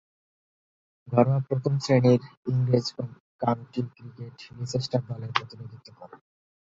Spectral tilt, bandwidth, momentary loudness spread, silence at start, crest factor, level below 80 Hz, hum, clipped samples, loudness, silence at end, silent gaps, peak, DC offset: -7 dB/octave; 7.8 kHz; 20 LU; 1.05 s; 24 dB; -64 dBFS; none; under 0.1%; -26 LUFS; 0.6 s; 2.37-2.43 s, 3.20-3.39 s; -4 dBFS; under 0.1%